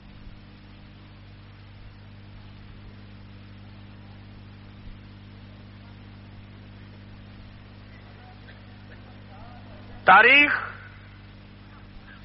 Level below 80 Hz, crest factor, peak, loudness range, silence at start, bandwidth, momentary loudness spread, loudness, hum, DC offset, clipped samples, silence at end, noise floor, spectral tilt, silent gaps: -52 dBFS; 26 dB; -4 dBFS; 25 LU; 10.05 s; 5.8 kHz; 30 LU; -16 LUFS; 50 Hz at -45 dBFS; under 0.1%; under 0.1%; 1.5 s; -46 dBFS; -1 dB/octave; none